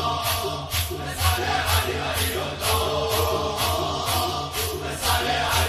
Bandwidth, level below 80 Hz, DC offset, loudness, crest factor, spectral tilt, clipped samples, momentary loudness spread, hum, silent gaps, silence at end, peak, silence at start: 16 kHz; -34 dBFS; under 0.1%; -24 LUFS; 16 dB; -3 dB/octave; under 0.1%; 4 LU; none; none; 0 s; -8 dBFS; 0 s